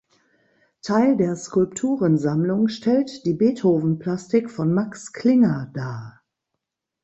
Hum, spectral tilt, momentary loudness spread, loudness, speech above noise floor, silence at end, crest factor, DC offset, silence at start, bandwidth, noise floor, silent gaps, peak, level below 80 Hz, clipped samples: none; -7 dB/octave; 11 LU; -21 LUFS; 61 dB; 0.95 s; 16 dB; under 0.1%; 0.85 s; 8.2 kHz; -81 dBFS; none; -6 dBFS; -62 dBFS; under 0.1%